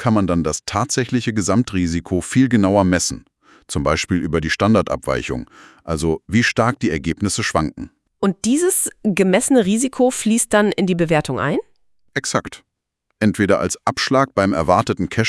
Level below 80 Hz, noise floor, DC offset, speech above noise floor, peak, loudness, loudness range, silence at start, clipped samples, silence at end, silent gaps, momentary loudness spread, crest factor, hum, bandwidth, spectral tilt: -44 dBFS; -74 dBFS; under 0.1%; 56 dB; 0 dBFS; -18 LUFS; 4 LU; 0 s; under 0.1%; 0 s; none; 7 LU; 18 dB; none; 12 kHz; -5 dB/octave